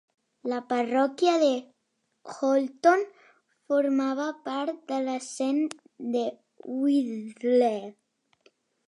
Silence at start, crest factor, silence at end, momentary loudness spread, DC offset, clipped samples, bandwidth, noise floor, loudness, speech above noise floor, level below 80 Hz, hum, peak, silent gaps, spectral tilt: 0.45 s; 18 dB; 0.95 s; 13 LU; under 0.1%; under 0.1%; 11 kHz; -76 dBFS; -27 LUFS; 51 dB; -86 dBFS; none; -10 dBFS; none; -4 dB/octave